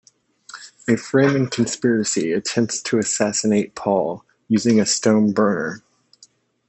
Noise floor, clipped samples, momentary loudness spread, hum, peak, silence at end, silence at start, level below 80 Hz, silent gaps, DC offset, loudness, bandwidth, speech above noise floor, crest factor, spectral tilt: -54 dBFS; under 0.1%; 13 LU; none; -4 dBFS; 0.9 s; 0.55 s; -64 dBFS; none; under 0.1%; -19 LUFS; 8.6 kHz; 36 dB; 18 dB; -4.5 dB/octave